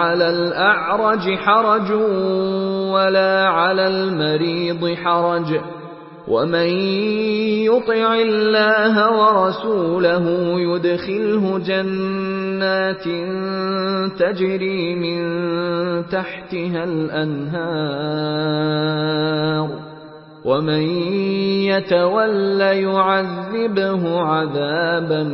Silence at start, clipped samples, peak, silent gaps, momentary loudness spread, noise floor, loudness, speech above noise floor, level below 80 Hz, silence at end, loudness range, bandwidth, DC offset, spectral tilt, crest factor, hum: 0 s; under 0.1%; -2 dBFS; none; 8 LU; -39 dBFS; -18 LUFS; 21 dB; -60 dBFS; 0 s; 5 LU; 5.8 kHz; under 0.1%; -11 dB/octave; 16 dB; none